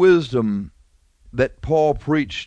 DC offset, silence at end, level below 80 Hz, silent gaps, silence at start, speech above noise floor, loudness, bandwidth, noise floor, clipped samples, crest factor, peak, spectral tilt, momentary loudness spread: under 0.1%; 0 s; -42 dBFS; none; 0 s; 38 dB; -20 LUFS; 8.6 kHz; -56 dBFS; under 0.1%; 16 dB; -4 dBFS; -7 dB/octave; 12 LU